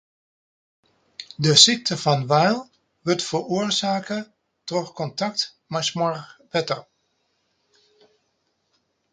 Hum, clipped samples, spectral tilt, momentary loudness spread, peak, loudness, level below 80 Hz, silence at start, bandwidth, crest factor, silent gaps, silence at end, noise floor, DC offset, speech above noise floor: none; under 0.1%; -3.5 dB/octave; 18 LU; 0 dBFS; -21 LUFS; -66 dBFS; 1.2 s; 9.6 kHz; 24 dB; none; 2.3 s; -72 dBFS; under 0.1%; 50 dB